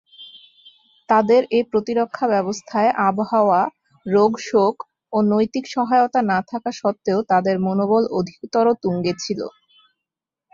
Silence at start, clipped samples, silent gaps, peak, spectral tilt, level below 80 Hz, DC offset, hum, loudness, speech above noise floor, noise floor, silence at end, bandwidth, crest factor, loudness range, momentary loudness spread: 0.2 s; under 0.1%; none; -4 dBFS; -6 dB/octave; -62 dBFS; under 0.1%; none; -19 LUFS; 67 dB; -85 dBFS; 1.05 s; 7.6 kHz; 16 dB; 2 LU; 9 LU